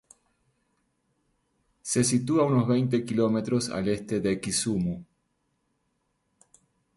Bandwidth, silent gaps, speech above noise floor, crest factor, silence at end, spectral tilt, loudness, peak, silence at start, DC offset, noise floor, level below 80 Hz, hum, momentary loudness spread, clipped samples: 11.5 kHz; none; 50 dB; 18 dB; 1.95 s; -5.5 dB/octave; -26 LUFS; -12 dBFS; 1.85 s; under 0.1%; -75 dBFS; -58 dBFS; none; 6 LU; under 0.1%